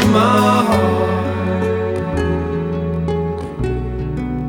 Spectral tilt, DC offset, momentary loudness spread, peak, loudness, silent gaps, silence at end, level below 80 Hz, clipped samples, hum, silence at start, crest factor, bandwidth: -6.5 dB/octave; under 0.1%; 10 LU; -2 dBFS; -18 LUFS; none; 0 s; -32 dBFS; under 0.1%; none; 0 s; 16 dB; 18.5 kHz